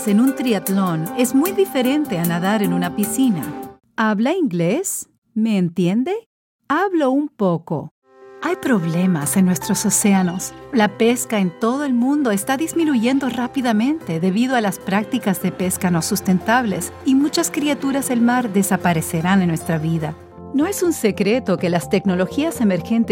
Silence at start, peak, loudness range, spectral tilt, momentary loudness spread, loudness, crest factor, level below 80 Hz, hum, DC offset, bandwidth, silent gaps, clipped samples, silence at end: 0 s; -2 dBFS; 3 LU; -5 dB/octave; 6 LU; -19 LUFS; 16 dB; -54 dBFS; none; under 0.1%; 16.5 kHz; 5.18-5.22 s, 6.26-6.59 s, 7.91-8.02 s; under 0.1%; 0 s